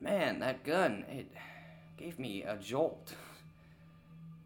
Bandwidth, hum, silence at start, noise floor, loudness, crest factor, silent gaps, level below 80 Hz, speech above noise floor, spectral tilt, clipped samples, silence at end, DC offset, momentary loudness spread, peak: 19 kHz; none; 0 s; -59 dBFS; -36 LUFS; 20 dB; none; -72 dBFS; 22 dB; -5.5 dB/octave; under 0.1%; 0 s; under 0.1%; 22 LU; -20 dBFS